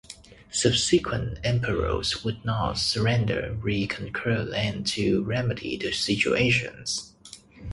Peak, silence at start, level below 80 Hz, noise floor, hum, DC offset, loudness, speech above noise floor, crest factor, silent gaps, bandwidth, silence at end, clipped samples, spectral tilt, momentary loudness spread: -6 dBFS; 0.1 s; -44 dBFS; -49 dBFS; none; under 0.1%; -25 LUFS; 23 dB; 20 dB; none; 11.5 kHz; 0 s; under 0.1%; -4.5 dB/octave; 9 LU